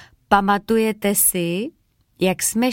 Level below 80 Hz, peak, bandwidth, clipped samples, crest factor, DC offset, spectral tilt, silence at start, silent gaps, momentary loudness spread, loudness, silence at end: -48 dBFS; -2 dBFS; 17 kHz; under 0.1%; 18 dB; under 0.1%; -3.5 dB/octave; 0.3 s; none; 8 LU; -19 LUFS; 0 s